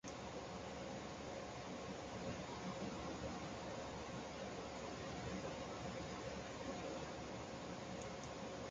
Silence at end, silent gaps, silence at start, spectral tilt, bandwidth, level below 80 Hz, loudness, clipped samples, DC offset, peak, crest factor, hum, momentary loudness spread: 0 s; none; 0.05 s; -4.5 dB/octave; 9.4 kHz; -64 dBFS; -48 LUFS; under 0.1%; under 0.1%; -34 dBFS; 14 dB; none; 2 LU